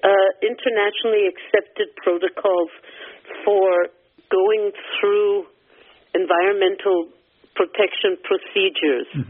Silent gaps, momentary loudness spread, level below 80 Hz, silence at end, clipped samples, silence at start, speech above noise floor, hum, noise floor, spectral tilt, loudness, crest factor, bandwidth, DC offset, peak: none; 10 LU; -70 dBFS; 0.05 s; under 0.1%; 0.05 s; 33 dB; none; -52 dBFS; -2 dB/octave; -20 LUFS; 18 dB; 3.8 kHz; under 0.1%; -2 dBFS